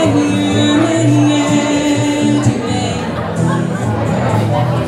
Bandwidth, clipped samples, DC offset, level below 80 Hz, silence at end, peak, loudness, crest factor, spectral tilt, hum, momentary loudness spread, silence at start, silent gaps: 12.5 kHz; under 0.1%; under 0.1%; -44 dBFS; 0 s; 0 dBFS; -14 LUFS; 12 dB; -6 dB/octave; none; 5 LU; 0 s; none